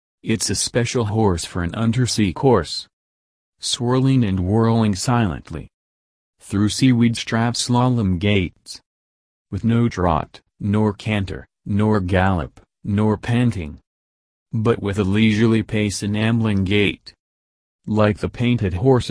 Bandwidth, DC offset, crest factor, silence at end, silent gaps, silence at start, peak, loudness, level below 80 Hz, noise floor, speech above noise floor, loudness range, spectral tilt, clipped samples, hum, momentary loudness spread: 11 kHz; under 0.1%; 18 dB; 0 s; 2.93-3.53 s, 5.74-6.33 s, 8.86-9.45 s, 13.87-14.46 s, 17.20-17.79 s; 0.25 s; -2 dBFS; -19 LUFS; -42 dBFS; under -90 dBFS; over 71 dB; 2 LU; -5.5 dB/octave; under 0.1%; none; 12 LU